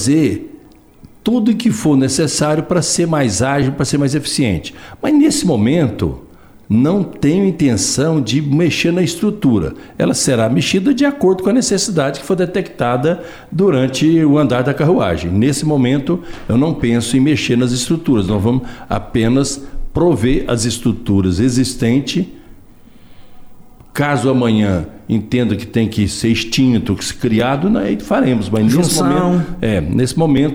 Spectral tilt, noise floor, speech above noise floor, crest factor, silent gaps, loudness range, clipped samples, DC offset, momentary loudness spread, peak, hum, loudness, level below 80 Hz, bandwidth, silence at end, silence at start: -5.5 dB/octave; -42 dBFS; 28 dB; 12 dB; none; 3 LU; under 0.1%; under 0.1%; 6 LU; -4 dBFS; none; -15 LUFS; -36 dBFS; 16 kHz; 0 s; 0 s